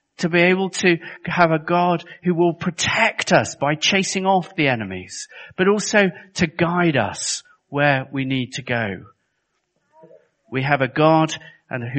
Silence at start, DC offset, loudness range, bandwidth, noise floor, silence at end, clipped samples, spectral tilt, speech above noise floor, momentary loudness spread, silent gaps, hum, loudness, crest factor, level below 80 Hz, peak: 0.2 s; under 0.1%; 5 LU; 8.8 kHz; -72 dBFS; 0 s; under 0.1%; -4.5 dB/octave; 52 dB; 12 LU; none; none; -19 LUFS; 20 dB; -56 dBFS; 0 dBFS